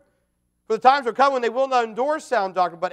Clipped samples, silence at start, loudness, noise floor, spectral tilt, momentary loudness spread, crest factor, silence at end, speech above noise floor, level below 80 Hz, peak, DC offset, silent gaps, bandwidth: under 0.1%; 0.7 s; -21 LUFS; -71 dBFS; -3.5 dB/octave; 6 LU; 20 dB; 0.05 s; 50 dB; -74 dBFS; -2 dBFS; under 0.1%; none; 11 kHz